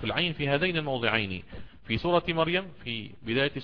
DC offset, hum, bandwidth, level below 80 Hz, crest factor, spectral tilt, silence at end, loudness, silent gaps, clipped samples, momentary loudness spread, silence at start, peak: 0.4%; none; 5.4 kHz; -52 dBFS; 20 dB; -8 dB/octave; 0 s; -28 LUFS; none; under 0.1%; 10 LU; 0 s; -10 dBFS